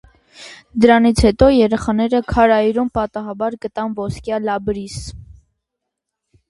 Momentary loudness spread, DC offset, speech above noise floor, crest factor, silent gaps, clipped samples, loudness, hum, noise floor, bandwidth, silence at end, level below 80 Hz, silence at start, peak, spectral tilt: 16 LU; under 0.1%; 63 dB; 18 dB; none; under 0.1%; -16 LUFS; none; -79 dBFS; 11.5 kHz; 1.25 s; -34 dBFS; 0.4 s; 0 dBFS; -6 dB/octave